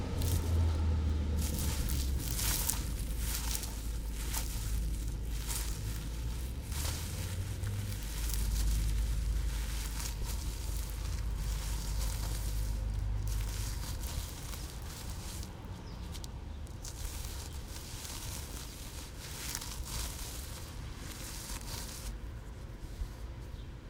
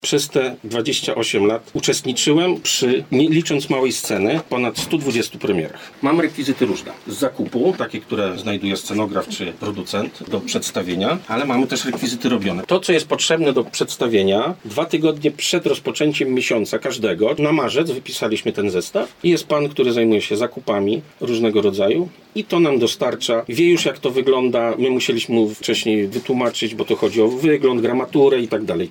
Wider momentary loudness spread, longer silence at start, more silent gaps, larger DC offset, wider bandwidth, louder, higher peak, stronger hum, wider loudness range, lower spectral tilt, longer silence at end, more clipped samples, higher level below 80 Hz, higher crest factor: first, 11 LU vs 7 LU; about the same, 0 s vs 0.05 s; neither; neither; about the same, 18 kHz vs 17.5 kHz; second, -38 LUFS vs -19 LUFS; about the same, -6 dBFS vs -4 dBFS; neither; first, 8 LU vs 4 LU; about the same, -4 dB/octave vs -4.5 dB/octave; about the same, 0 s vs 0 s; neither; first, -38 dBFS vs -62 dBFS; first, 28 dB vs 16 dB